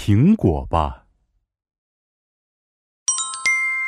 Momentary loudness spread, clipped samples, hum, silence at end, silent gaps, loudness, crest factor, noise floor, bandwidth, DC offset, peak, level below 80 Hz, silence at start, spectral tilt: 8 LU; under 0.1%; none; 0 s; 1.78-3.06 s; -19 LUFS; 20 dB; -68 dBFS; 12 kHz; under 0.1%; -2 dBFS; -38 dBFS; 0 s; -4.5 dB/octave